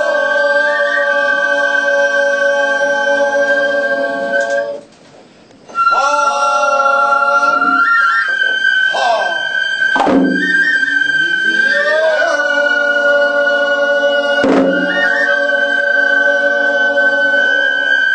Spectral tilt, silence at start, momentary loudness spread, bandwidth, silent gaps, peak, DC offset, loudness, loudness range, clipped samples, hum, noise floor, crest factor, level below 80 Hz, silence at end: -3 dB/octave; 0 s; 3 LU; 9 kHz; none; -2 dBFS; under 0.1%; -12 LUFS; 3 LU; under 0.1%; none; -42 dBFS; 12 dB; -58 dBFS; 0 s